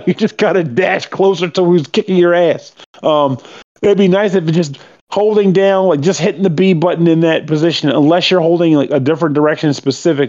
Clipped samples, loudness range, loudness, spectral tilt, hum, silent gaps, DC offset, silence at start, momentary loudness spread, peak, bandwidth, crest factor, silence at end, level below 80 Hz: under 0.1%; 2 LU; -13 LUFS; -6.5 dB/octave; none; 2.86-2.93 s, 3.64-3.75 s, 5.01-5.07 s; under 0.1%; 0 s; 5 LU; 0 dBFS; 7.8 kHz; 12 dB; 0 s; -62 dBFS